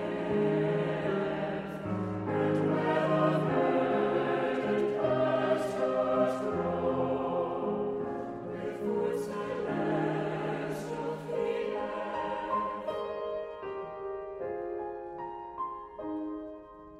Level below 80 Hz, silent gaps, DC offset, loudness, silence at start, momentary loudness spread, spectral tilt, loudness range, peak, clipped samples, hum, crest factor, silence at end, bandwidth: -62 dBFS; none; under 0.1%; -32 LUFS; 0 s; 11 LU; -7.5 dB/octave; 8 LU; -14 dBFS; under 0.1%; none; 16 dB; 0 s; 13 kHz